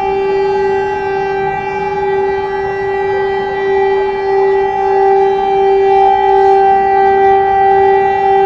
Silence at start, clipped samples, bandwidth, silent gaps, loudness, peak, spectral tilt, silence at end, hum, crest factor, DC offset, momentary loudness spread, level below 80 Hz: 0 s; under 0.1%; 6.2 kHz; none; -12 LUFS; 0 dBFS; -6.5 dB/octave; 0 s; none; 10 dB; under 0.1%; 7 LU; -40 dBFS